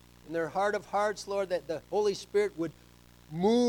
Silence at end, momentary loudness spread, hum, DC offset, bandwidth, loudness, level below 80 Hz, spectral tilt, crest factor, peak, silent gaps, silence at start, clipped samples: 0 s; 8 LU; 60 Hz at -60 dBFS; under 0.1%; 18 kHz; -32 LUFS; -62 dBFS; -5 dB/octave; 14 dB; -16 dBFS; none; 0.25 s; under 0.1%